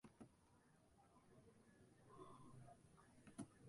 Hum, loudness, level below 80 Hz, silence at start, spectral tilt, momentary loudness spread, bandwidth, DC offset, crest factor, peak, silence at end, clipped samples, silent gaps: none; -65 LUFS; -82 dBFS; 0.05 s; -6 dB/octave; 9 LU; 11.5 kHz; under 0.1%; 24 dB; -40 dBFS; 0 s; under 0.1%; none